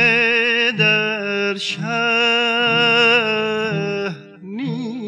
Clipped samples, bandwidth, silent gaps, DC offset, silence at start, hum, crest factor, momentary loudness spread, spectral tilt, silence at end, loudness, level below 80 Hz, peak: under 0.1%; 11 kHz; none; under 0.1%; 0 s; none; 14 dB; 12 LU; -4.5 dB/octave; 0 s; -16 LUFS; -72 dBFS; -4 dBFS